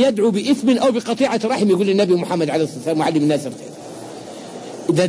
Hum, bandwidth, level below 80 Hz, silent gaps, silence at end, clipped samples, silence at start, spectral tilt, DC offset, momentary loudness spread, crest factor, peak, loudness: none; 11 kHz; -62 dBFS; none; 0 s; under 0.1%; 0 s; -6 dB/octave; under 0.1%; 17 LU; 14 dB; -4 dBFS; -18 LUFS